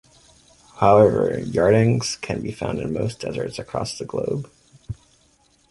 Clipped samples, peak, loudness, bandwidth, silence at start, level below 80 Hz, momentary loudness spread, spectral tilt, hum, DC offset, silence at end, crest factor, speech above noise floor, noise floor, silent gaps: under 0.1%; -2 dBFS; -21 LUFS; 11.5 kHz; 0.75 s; -48 dBFS; 20 LU; -6 dB/octave; none; under 0.1%; 0.8 s; 20 dB; 39 dB; -60 dBFS; none